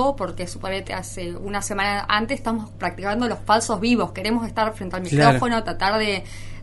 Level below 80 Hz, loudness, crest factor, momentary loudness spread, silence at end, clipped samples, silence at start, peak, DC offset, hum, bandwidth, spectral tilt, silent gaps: -40 dBFS; -22 LUFS; 20 dB; 12 LU; 0 s; under 0.1%; 0 s; -2 dBFS; under 0.1%; none; 11.5 kHz; -4.5 dB/octave; none